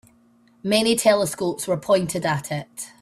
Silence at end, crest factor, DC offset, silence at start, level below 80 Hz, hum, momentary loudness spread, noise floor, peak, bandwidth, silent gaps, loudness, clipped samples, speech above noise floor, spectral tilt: 0.15 s; 20 dB; under 0.1%; 0.65 s; -60 dBFS; none; 13 LU; -57 dBFS; -4 dBFS; 15.5 kHz; none; -21 LUFS; under 0.1%; 35 dB; -4 dB/octave